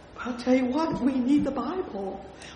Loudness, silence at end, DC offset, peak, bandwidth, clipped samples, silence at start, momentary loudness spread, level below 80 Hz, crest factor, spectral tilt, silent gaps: -27 LUFS; 0 s; under 0.1%; -10 dBFS; 10 kHz; under 0.1%; 0 s; 12 LU; -52 dBFS; 16 dB; -6.5 dB/octave; none